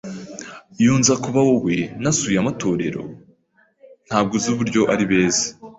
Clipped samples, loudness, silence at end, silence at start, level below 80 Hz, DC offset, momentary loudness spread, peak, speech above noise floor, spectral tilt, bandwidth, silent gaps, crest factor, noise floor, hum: under 0.1%; -19 LUFS; 0.05 s; 0.05 s; -52 dBFS; under 0.1%; 16 LU; -2 dBFS; 41 dB; -4.5 dB/octave; 8.2 kHz; none; 18 dB; -60 dBFS; none